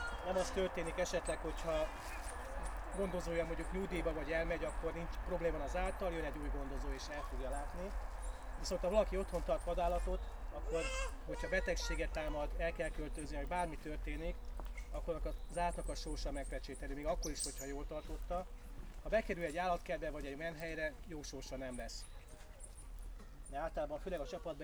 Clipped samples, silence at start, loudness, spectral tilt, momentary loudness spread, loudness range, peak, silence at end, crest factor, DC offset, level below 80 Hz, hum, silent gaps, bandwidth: under 0.1%; 0 s; -42 LUFS; -4.5 dB/octave; 11 LU; 4 LU; -20 dBFS; 0 s; 20 dB; under 0.1%; -46 dBFS; none; none; over 20 kHz